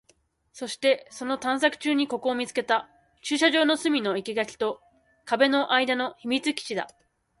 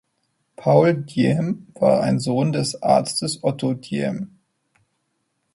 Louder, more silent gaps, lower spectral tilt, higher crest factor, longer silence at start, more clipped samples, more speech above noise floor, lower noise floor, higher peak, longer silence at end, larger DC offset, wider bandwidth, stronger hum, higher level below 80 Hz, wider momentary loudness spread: second, -25 LUFS vs -20 LUFS; neither; second, -2.5 dB/octave vs -6 dB/octave; about the same, 20 dB vs 20 dB; about the same, 0.55 s vs 0.6 s; neither; second, 40 dB vs 53 dB; second, -66 dBFS vs -72 dBFS; second, -6 dBFS vs 0 dBFS; second, 0.5 s vs 1.3 s; neither; about the same, 11.5 kHz vs 11.5 kHz; neither; second, -72 dBFS vs -60 dBFS; about the same, 10 LU vs 10 LU